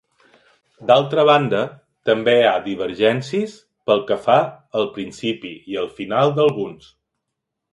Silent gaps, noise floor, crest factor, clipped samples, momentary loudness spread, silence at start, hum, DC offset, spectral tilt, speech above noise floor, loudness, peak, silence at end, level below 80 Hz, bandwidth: none; -80 dBFS; 18 dB; under 0.1%; 14 LU; 0.8 s; none; under 0.1%; -6 dB/octave; 61 dB; -19 LUFS; 0 dBFS; 1 s; -62 dBFS; 11.5 kHz